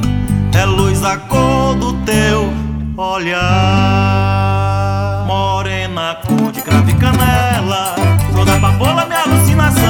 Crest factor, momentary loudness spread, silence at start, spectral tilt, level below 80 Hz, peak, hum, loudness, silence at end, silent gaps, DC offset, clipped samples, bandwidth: 12 dB; 6 LU; 0 s; -5.5 dB/octave; -26 dBFS; 0 dBFS; none; -13 LUFS; 0 s; none; under 0.1%; under 0.1%; 20 kHz